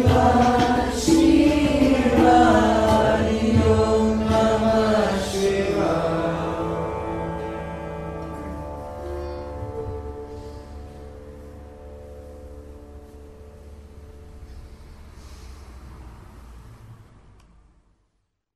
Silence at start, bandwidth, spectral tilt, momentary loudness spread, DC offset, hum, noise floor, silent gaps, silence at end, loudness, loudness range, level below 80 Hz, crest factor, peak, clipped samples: 0 s; 15 kHz; -6 dB/octave; 25 LU; under 0.1%; none; -72 dBFS; none; 1.55 s; -20 LUFS; 25 LU; -36 dBFS; 18 dB; -4 dBFS; under 0.1%